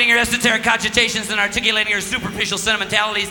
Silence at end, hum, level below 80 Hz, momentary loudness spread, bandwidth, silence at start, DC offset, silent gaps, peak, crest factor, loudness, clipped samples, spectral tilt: 0 s; none; -44 dBFS; 5 LU; over 20 kHz; 0 s; under 0.1%; none; 0 dBFS; 18 dB; -17 LUFS; under 0.1%; -1.5 dB/octave